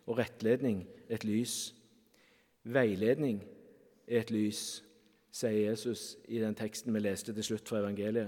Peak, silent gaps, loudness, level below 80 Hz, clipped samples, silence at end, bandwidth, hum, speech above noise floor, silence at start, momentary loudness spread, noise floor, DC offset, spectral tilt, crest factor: -16 dBFS; none; -35 LUFS; -78 dBFS; under 0.1%; 0 s; 17.5 kHz; none; 34 dB; 0.05 s; 11 LU; -68 dBFS; under 0.1%; -5 dB/octave; 20 dB